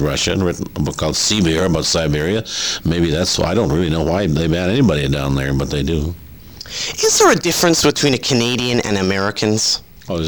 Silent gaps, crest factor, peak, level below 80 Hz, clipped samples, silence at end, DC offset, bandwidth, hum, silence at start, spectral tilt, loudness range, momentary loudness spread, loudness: none; 16 dB; 0 dBFS; -32 dBFS; under 0.1%; 0 s; 0.5%; over 20 kHz; none; 0 s; -4 dB/octave; 3 LU; 8 LU; -16 LUFS